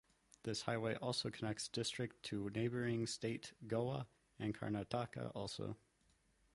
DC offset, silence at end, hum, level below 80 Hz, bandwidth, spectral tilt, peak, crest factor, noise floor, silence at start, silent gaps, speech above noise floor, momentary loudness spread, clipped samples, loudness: under 0.1%; 0.8 s; none; -72 dBFS; 11.5 kHz; -5 dB/octave; -24 dBFS; 20 dB; -76 dBFS; 0.45 s; none; 34 dB; 7 LU; under 0.1%; -43 LUFS